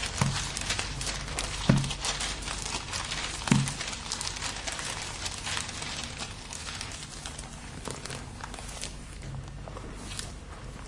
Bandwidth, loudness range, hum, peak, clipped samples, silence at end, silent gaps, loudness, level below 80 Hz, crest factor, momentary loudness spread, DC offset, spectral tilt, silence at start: 11.5 kHz; 10 LU; none; -10 dBFS; under 0.1%; 0 s; none; -33 LUFS; -44 dBFS; 24 dB; 14 LU; under 0.1%; -3.5 dB/octave; 0 s